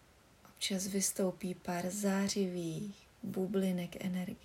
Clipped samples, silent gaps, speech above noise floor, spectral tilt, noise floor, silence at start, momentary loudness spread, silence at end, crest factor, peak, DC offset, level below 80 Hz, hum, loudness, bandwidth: under 0.1%; none; 26 dB; -4.5 dB/octave; -62 dBFS; 0.45 s; 9 LU; 0.05 s; 16 dB; -22 dBFS; under 0.1%; -70 dBFS; none; -36 LUFS; 16 kHz